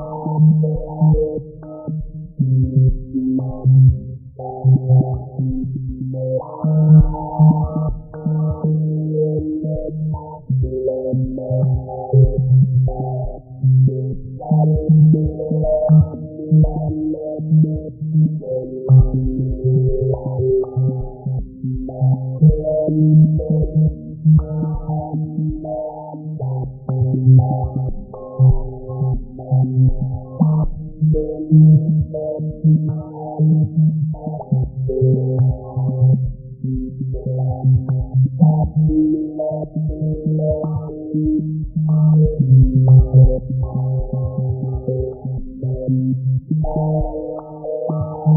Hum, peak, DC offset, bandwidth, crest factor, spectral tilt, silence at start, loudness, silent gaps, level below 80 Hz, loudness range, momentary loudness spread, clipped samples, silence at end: none; -2 dBFS; under 0.1%; 1.4 kHz; 16 dB; -10 dB/octave; 0 s; -17 LUFS; none; -30 dBFS; 5 LU; 13 LU; under 0.1%; 0 s